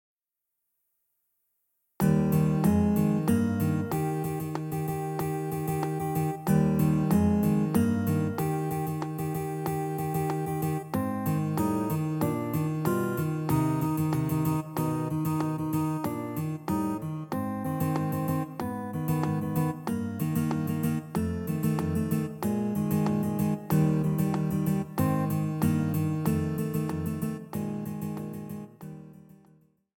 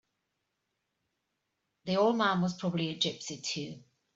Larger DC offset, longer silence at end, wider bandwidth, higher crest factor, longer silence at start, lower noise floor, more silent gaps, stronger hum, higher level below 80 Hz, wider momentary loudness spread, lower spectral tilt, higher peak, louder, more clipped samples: neither; first, 0.85 s vs 0.35 s; first, 17 kHz vs 8 kHz; about the same, 16 dB vs 20 dB; first, 2 s vs 1.85 s; about the same, -85 dBFS vs -83 dBFS; neither; neither; first, -52 dBFS vs -74 dBFS; second, 8 LU vs 11 LU; first, -7.5 dB/octave vs -4.5 dB/octave; about the same, -12 dBFS vs -14 dBFS; about the same, -29 LUFS vs -31 LUFS; neither